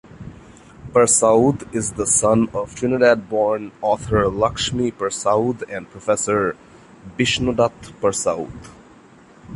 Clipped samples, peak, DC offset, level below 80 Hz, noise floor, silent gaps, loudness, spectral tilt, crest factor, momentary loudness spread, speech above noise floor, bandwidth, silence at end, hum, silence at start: under 0.1%; -2 dBFS; under 0.1%; -44 dBFS; -47 dBFS; none; -19 LUFS; -4 dB/octave; 18 dB; 14 LU; 28 dB; 11.5 kHz; 0 s; none; 0.1 s